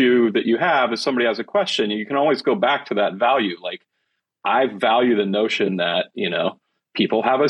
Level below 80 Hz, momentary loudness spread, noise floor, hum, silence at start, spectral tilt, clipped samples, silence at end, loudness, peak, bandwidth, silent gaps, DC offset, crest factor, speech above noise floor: -74 dBFS; 7 LU; -75 dBFS; none; 0 s; -5 dB/octave; under 0.1%; 0 s; -20 LUFS; -4 dBFS; 10.5 kHz; none; under 0.1%; 16 dB; 55 dB